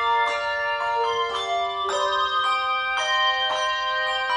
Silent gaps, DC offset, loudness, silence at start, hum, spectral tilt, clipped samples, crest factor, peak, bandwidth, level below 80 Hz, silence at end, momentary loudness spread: none; under 0.1%; -23 LUFS; 0 s; 60 Hz at -65 dBFS; 0 dB/octave; under 0.1%; 14 dB; -10 dBFS; 10.5 kHz; -58 dBFS; 0 s; 4 LU